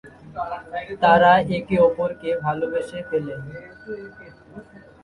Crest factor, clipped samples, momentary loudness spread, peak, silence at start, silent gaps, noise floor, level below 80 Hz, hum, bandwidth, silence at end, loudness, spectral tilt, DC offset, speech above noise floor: 20 dB; under 0.1%; 21 LU; -2 dBFS; 0.05 s; none; -43 dBFS; -52 dBFS; none; 11 kHz; 0.25 s; -21 LUFS; -7 dB/octave; under 0.1%; 22 dB